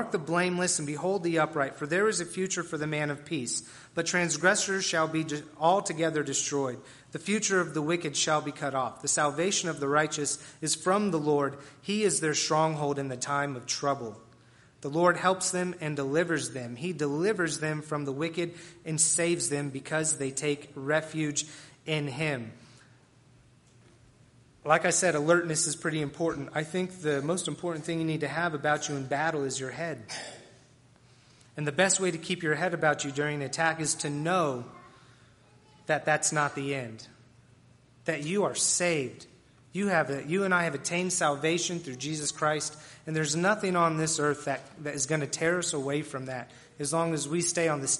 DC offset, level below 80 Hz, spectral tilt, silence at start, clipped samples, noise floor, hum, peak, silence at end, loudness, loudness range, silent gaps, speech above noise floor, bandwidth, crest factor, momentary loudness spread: under 0.1%; -70 dBFS; -3.5 dB/octave; 0 s; under 0.1%; -59 dBFS; none; -6 dBFS; 0 s; -29 LUFS; 4 LU; none; 30 dB; 11.5 kHz; 22 dB; 10 LU